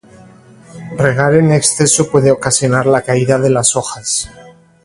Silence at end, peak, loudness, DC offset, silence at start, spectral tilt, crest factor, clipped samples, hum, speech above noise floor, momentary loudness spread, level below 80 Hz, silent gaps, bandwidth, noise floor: 0.35 s; 0 dBFS; -12 LUFS; under 0.1%; 0.75 s; -4.5 dB/octave; 14 dB; under 0.1%; none; 28 dB; 8 LU; -46 dBFS; none; 11.5 kHz; -40 dBFS